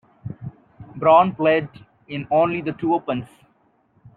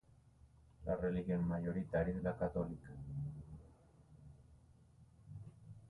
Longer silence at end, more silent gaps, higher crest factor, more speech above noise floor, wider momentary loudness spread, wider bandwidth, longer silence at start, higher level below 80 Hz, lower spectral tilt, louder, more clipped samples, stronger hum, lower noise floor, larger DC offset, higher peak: first, 0.9 s vs 0 s; neither; about the same, 20 dB vs 18 dB; first, 43 dB vs 27 dB; about the same, 22 LU vs 21 LU; first, 4.5 kHz vs 3.9 kHz; second, 0.25 s vs 0.45 s; about the same, -60 dBFS vs -58 dBFS; about the same, -9 dB/octave vs -10 dB/octave; first, -19 LUFS vs -41 LUFS; neither; neither; second, -62 dBFS vs -66 dBFS; neither; first, -2 dBFS vs -24 dBFS